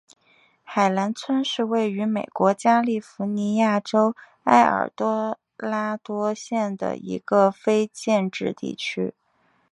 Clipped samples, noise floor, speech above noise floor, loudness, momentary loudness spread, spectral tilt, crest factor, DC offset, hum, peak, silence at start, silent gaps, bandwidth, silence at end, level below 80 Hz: under 0.1%; -65 dBFS; 43 dB; -23 LUFS; 10 LU; -5.5 dB/octave; 22 dB; under 0.1%; none; -2 dBFS; 0.7 s; none; 11.5 kHz; 0.6 s; -70 dBFS